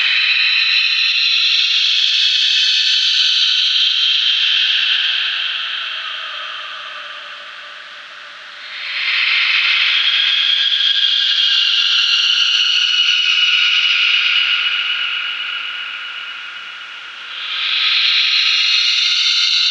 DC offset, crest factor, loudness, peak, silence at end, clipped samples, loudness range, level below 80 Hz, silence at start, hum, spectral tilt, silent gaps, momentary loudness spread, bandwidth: under 0.1%; 14 dB; -12 LUFS; -2 dBFS; 0 s; under 0.1%; 9 LU; -86 dBFS; 0 s; none; 5 dB/octave; none; 17 LU; 9.8 kHz